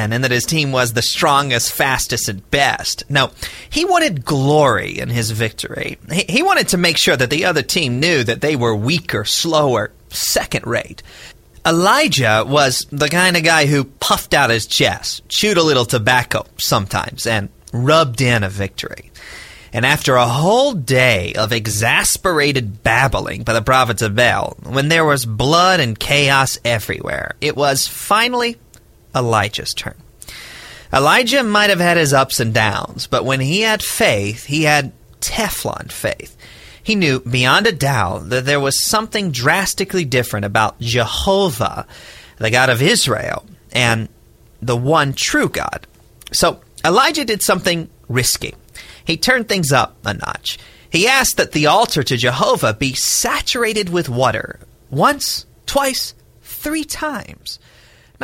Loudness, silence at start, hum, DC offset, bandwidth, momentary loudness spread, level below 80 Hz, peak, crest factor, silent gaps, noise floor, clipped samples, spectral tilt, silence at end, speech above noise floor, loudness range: -15 LUFS; 0 s; none; under 0.1%; 16.5 kHz; 11 LU; -40 dBFS; 0 dBFS; 16 dB; none; -47 dBFS; under 0.1%; -3.5 dB/octave; 0 s; 31 dB; 4 LU